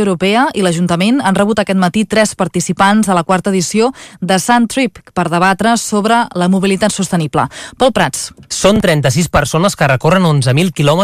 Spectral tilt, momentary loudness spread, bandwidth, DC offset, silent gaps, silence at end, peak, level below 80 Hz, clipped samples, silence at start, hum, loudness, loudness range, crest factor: -5 dB/octave; 5 LU; 15.5 kHz; under 0.1%; none; 0 s; 0 dBFS; -38 dBFS; under 0.1%; 0 s; none; -12 LUFS; 1 LU; 12 dB